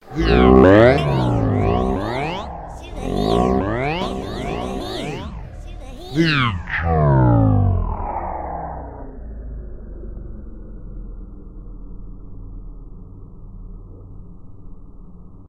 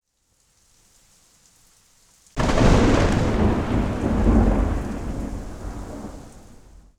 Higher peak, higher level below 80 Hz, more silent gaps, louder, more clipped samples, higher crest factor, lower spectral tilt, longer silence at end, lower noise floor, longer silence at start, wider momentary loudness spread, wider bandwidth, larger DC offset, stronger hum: first, 0 dBFS vs -4 dBFS; about the same, -30 dBFS vs -28 dBFS; neither; first, -18 LUFS vs -21 LUFS; neither; about the same, 20 dB vs 18 dB; about the same, -7.5 dB/octave vs -6.5 dB/octave; second, 0 s vs 0.45 s; second, -39 dBFS vs -65 dBFS; second, 0.05 s vs 2.35 s; first, 25 LU vs 18 LU; about the same, 12 kHz vs 12 kHz; neither; neither